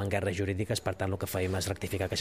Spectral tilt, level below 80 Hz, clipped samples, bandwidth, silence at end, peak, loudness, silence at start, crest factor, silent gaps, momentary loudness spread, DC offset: -5 dB/octave; -54 dBFS; under 0.1%; 15.5 kHz; 0 s; -14 dBFS; -32 LUFS; 0 s; 18 dB; none; 2 LU; 0.1%